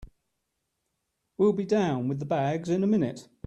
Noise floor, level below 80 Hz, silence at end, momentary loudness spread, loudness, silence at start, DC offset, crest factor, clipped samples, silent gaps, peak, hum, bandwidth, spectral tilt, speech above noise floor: -80 dBFS; -58 dBFS; 0.25 s; 4 LU; -27 LUFS; 0 s; under 0.1%; 16 dB; under 0.1%; none; -12 dBFS; none; 8.8 kHz; -7.5 dB/octave; 55 dB